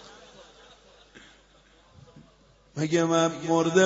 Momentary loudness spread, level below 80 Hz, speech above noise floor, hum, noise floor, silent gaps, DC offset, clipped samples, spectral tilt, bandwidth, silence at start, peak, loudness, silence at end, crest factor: 24 LU; -64 dBFS; 36 dB; none; -59 dBFS; none; under 0.1%; under 0.1%; -5 dB/octave; 8 kHz; 1.15 s; -8 dBFS; -25 LUFS; 0 s; 20 dB